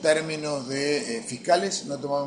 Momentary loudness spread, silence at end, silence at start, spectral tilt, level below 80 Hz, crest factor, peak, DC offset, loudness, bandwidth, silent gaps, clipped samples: 7 LU; 0 s; 0 s; -3.5 dB/octave; -68 dBFS; 18 dB; -8 dBFS; under 0.1%; -26 LUFS; 10.5 kHz; none; under 0.1%